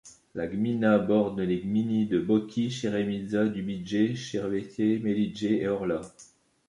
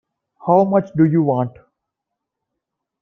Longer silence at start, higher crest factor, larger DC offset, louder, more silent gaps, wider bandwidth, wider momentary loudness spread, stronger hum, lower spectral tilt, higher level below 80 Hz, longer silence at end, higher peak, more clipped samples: second, 0.05 s vs 0.45 s; about the same, 18 dB vs 18 dB; neither; second, -28 LUFS vs -17 LUFS; neither; first, 10.5 kHz vs 6 kHz; second, 8 LU vs 11 LU; neither; second, -7 dB/octave vs -11.5 dB/octave; about the same, -60 dBFS vs -62 dBFS; second, 0.45 s vs 1.5 s; second, -10 dBFS vs -2 dBFS; neither